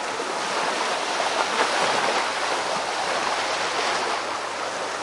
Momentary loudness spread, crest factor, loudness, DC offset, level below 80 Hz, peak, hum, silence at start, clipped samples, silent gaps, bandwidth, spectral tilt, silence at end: 6 LU; 18 dB; -24 LUFS; under 0.1%; -68 dBFS; -6 dBFS; none; 0 s; under 0.1%; none; 11.5 kHz; -1 dB/octave; 0 s